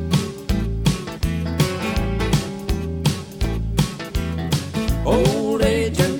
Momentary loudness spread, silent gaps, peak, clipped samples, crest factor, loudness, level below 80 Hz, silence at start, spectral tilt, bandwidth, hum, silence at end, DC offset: 7 LU; none; -4 dBFS; under 0.1%; 16 dB; -22 LUFS; -28 dBFS; 0 s; -5.5 dB/octave; 18 kHz; none; 0 s; under 0.1%